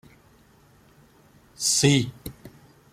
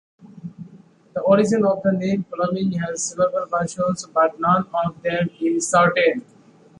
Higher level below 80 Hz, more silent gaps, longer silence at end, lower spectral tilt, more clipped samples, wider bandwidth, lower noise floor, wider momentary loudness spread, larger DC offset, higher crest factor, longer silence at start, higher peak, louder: about the same, -56 dBFS vs -60 dBFS; neither; second, 0.45 s vs 0.6 s; second, -3.5 dB/octave vs -5 dB/octave; neither; first, 15.5 kHz vs 11.5 kHz; first, -56 dBFS vs -48 dBFS; first, 22 LU vs 10 LU; neither; about the same, 22 dB vs 18 dB; first, 1.6 s vs 0.25 s; about the same, -6 dBFS vs -4 dBFS; about the same, -22 LUFS vs -20 LUFS